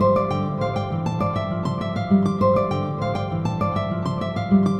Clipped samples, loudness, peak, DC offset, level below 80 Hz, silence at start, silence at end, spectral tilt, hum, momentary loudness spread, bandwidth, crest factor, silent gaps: under 0.1%; -23 LUFS; -6 dBFS; under 0.1%; -46 dBFS; 0 s; 0 s; -8.5 dB/octave; none; 6 LU; 8.8 kHz; 14 dB; none